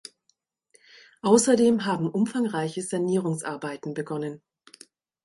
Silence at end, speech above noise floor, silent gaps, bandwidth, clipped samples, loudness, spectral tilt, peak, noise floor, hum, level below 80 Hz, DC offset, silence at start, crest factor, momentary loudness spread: 0.85 s; 48 dB; none; 11.5 kHz; under 0.1%; -25 LUFS; -5 dB/octave; -6 dBFS; -72 dBFS; none; -70 dBFS; under 0.1%; 1.25 s; 22 dB; 14 LU